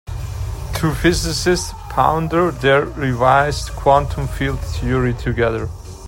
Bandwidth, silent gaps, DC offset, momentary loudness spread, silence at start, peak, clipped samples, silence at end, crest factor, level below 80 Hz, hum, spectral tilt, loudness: 16.5 kHz; none; under 0.1%; 11 LU; 0.05 s; 0 dBFS; under 0.1%; 0 s; 18 dB; -30 dBFS; none; -5.5 dB/octave; -18 LUFS